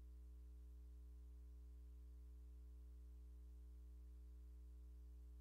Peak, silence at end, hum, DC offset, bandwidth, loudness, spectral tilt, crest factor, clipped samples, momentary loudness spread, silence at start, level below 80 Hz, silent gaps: -54 dBFS; 0 s; 60 Hz at -60 dBFS; under 0.1%; 15 kHz; -62 LUFS; -7.5 dB/octave; 4 dB; under 0.1%; 0 LU; 0 s; -58 dBFS; none